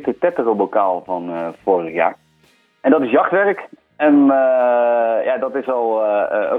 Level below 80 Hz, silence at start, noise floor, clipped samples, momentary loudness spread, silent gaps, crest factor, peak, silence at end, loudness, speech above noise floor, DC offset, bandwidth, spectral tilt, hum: -66 dBFS; 0 s; -56 dBFS; under 0.1%; 9 LU; none; 16 dB; 0 dBFS; 0 s; -17 LUFS; 40 dB; under 0.1%; 3.9 kHz; -8.5 dB/octave; none